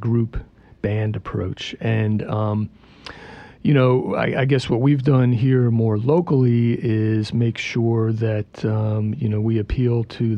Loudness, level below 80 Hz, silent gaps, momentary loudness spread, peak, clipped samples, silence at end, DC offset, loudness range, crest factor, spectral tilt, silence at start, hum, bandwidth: -20 LUFS; -42 dBFS; none; 11 LU; -6 dBFS; under 0.1%; 0 s; under 0.1%; 6 LU; 14 dB; -8.5 dB/octave; 0 s; none; 8.4 kHz